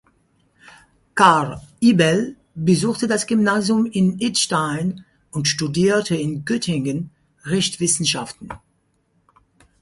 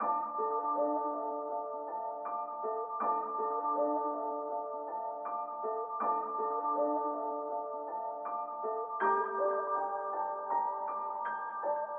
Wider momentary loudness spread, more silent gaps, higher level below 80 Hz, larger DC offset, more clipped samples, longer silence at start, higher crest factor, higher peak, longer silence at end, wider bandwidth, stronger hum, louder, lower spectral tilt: first, 15 LU vs 7 LU; neither; first, -56 dBFS vs -90 dBFS; neither; neither; first, 1.15 s vs 0 s; about the same, 20 dB vs 16 dB; first, 0 dBFS vs -18 dBFS; first, 1.25 s vs 0 s; first, 11.5 kHz vs 3.4 kHz; neither; first, -19 LUFS vs -35 LUFS; first, -4.5 dB/octave vs 3 dB/octave